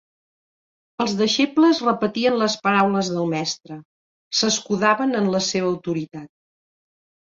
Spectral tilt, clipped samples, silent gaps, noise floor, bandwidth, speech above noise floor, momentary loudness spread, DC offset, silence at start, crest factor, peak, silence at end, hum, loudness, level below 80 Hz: -4 dB/octave; under 0.1%; 3.85-4.31 s; under -90 dBFS; 7.8 kHz; over 70 dB; 14 LU; under 0.1%; 1 s; 18 dB; -4 dBFS; 1.15 s; none; -20 LUFS; -64 dBFS